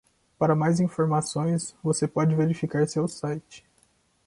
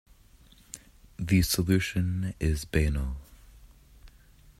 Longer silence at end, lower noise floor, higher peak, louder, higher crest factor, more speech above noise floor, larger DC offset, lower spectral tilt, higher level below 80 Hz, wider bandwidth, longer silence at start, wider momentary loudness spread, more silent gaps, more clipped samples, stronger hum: first, 0.7 s vs 0.5 s; first, -65 dBFS vs -56 dBFS; about the same, -10 dBFS vs -10 dBFS; first, -25 LUFS vs -28 LUFS; about the same, 16 dB vs 20 dB; first, 41 dB vs 30 dB; neither; about the same, -6.5 dB/octave vs -5.5 dB/octave; second, -62 dBFS vs -40 dBFS; second, 11.5 kHz vs 16 kHz; second, 0.4 s vs 0.75 s; second, 6 LU vs 21 LU; neither; neither; neither